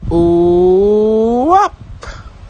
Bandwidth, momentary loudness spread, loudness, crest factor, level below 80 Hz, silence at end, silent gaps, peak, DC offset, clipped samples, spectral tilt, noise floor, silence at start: 9 kHz; 21 LU; -11 LUFS; 12 dB; -30 dBFS; 0 s; none; 0 dBFS; under 0.1%; under 0.1%; -8 dB/octave; -30 dBFS; 0 s